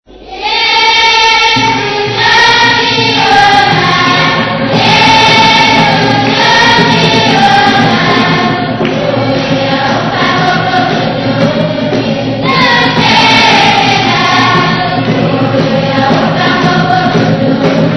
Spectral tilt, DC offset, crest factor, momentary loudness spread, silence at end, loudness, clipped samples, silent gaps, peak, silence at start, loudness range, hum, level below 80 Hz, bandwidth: -4.5 dB/octave; under 0.1%; 8 dB; 7 LU; 0 s; -7 LUFS; 1%; none; 0 dBFS; 0.2 s; 4 LU; none; -36 dBFS; 11 kHz